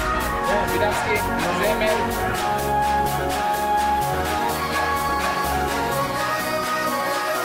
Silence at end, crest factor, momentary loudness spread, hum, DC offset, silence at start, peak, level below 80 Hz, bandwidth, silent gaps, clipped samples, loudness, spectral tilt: 0 s; 14 dB; 2 LU; none; under 0.1%; 0 s; -8 dBFS; -38 dBFS; 16 kHz; none; under 0.1%; -22 LUFS; -4 dB/octave